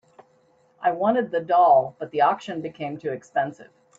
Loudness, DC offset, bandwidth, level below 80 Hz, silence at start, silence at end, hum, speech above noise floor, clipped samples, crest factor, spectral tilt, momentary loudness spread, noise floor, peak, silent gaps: -23 LUFS; under 0.1%; 7.6 kHz; -72 dBFS; 0.8 s; 0.35 s; none; 39 dB; under 0.1%; 16 dB; -6.5 dB/octave; 14 LU; -61 dBFS; -6 dBFS; none